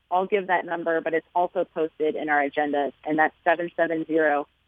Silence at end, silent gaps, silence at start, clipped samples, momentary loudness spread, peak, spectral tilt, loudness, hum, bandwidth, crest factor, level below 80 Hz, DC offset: 0.25 s; none; 0.1 s; under 0.1%; 5 LU; -6 dBFS; -8 dB/octave; -25 LUFS; none; 3.9 kHz; 18 dB; -72 dBFS; under 0.1%